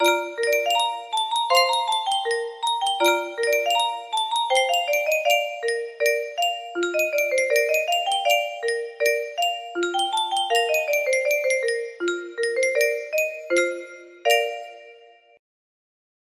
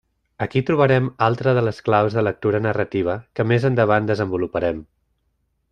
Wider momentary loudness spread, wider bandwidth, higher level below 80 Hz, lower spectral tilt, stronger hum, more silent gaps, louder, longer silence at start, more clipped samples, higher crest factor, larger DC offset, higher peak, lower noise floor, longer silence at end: about the same, 7 LU vs 7 LU; first, 15.5 kHz vs 8.8 kHz; second, -74 dBFS vs -52 dBFS; second, 0.5 dB/octave vs -8.5 dB/octave; neither; neither; about the same, -22 LUFS vs -20 LUFS; second, 0 s vs 0.4 s; neither; about the same, 18 dB vs 18 dB; neither; second, -6 dBFS vs -2 dBFS; second, -50 dBFS vs -69 dBFS; first, 1.4 s vs 0.9 s